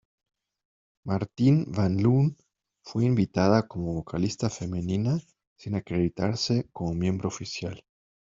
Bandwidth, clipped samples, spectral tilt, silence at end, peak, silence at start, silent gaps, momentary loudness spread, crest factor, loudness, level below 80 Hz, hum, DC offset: 7.8 kHz; under 0.1%; -7 dB/octave; 0.45 s; -6 dBFS; 1.05 s; 5.47-5.56 s; 11 LU; 20 dB; -27 LUFS; -56 dBFS; none; under 0.1%